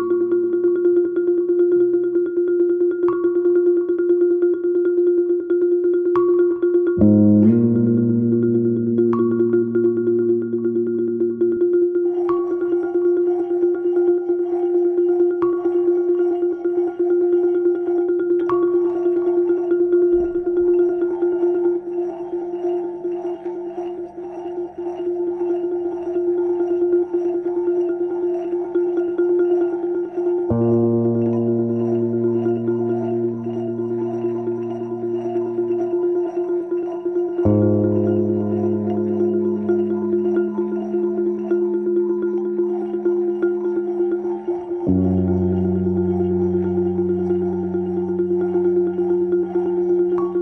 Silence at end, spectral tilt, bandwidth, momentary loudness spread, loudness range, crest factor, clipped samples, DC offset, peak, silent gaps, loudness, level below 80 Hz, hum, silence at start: 0 s; -11.5 dB/octave; 3 kHz; 7 LU; 6 LU; 16 dB; under 0.1%; under 0.1%; -4 dBFS; none; -19 LUFS; -54 dBFS; none; 0 s